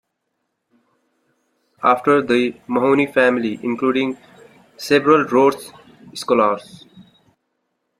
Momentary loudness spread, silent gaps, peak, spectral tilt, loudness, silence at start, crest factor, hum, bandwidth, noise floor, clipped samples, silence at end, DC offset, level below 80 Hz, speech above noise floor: 17 LU; none; -2 dBFS; -5.5 dB/octave; -17 LUFS; 1.8 s; 18 dB; none; 15 kHz; -74 dBFS; under 0.1%; 1 s; under 0.1%; -64 dBFS; 57 dB